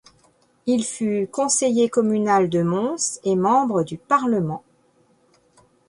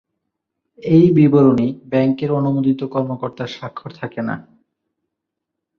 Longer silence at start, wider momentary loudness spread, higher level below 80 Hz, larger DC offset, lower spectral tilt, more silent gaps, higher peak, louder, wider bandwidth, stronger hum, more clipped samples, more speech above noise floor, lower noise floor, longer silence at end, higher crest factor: second, 0.65 s vs 0.85 s; second, 6 LU vs 18 LU; second, -62 dBFS vs -56 dBFS; neither; second, -5 dB/octave vs -9.5 dB/octave; neither; second, -6 dBFS vs -2 dBFS; second, -21 LUFS vs -16 LUFS; first, 11.5 kHz vs 6.6 kHz; neither; neither; second, 40 dB vs 64 dB; second, -60 dBFS vs -80 dBFS; about the same, 1.3 s vs 1.4 s; about the same, 16 dB vs 16 dB